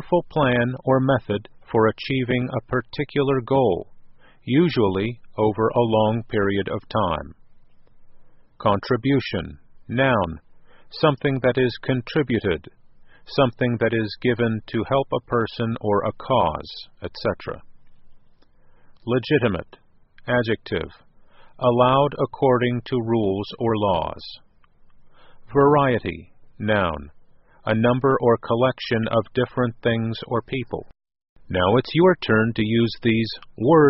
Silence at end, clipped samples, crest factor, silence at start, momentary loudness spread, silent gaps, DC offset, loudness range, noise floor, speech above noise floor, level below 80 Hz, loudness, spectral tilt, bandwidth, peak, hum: 0 s; under 0.1%; 18 dB; 0 s; 11 LU; 31.29-31.36 s; under 0.1%; 4 LU; -51 dBFS; 30 dB; -48 dBFS; -22 LUFS; -5 dB/octave; 5.8 kHz; -4 dBFS; none